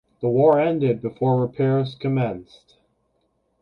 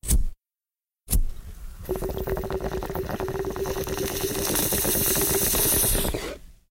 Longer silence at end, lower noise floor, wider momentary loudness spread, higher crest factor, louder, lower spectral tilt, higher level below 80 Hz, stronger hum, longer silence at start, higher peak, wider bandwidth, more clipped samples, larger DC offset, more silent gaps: first, 1.2 s vs 0.15 s; second, -69 dBFS vs under -90 dBFS; second, 7 LU vs 17 LU; about the same, 16 dB vs 16 dB; first, -21 LUFS vs -24 LUFS; first, -10 dB/octave vs -3 dB/octave; second, -60 dBFS vs -32 dBFS; neither; first, 0.2 s vs 0.05 s; first, -6 dBFS vs -10 dBFS; second, 5.4 kHz vs 17 kHz; neither; neither; neither